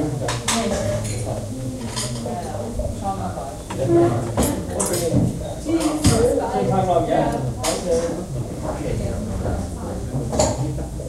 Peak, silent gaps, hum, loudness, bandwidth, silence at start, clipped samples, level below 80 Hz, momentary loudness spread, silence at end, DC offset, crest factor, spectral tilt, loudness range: -2 dBFS; none; none; -22 LUFS; 16 kHz; 0 s; under 0.1%; -34 dBFS; 9 LU; 0 s; under 0.1%; 20 dB; -5.5 dB/octave; 5 LU